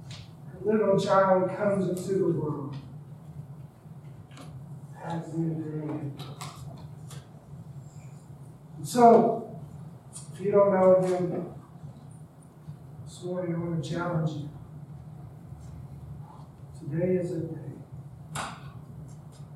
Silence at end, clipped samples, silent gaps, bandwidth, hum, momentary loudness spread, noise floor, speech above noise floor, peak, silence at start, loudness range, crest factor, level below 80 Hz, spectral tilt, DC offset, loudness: 0 s; under 0.1%; none; 14 kHz; none; 24 LU; -49 dBFS; 24 dB; -6 dBFS; 0 s; 13 LU; 22 dB; -60 dBFS; -7 dB/octave; under 0.1%; -26 LUFS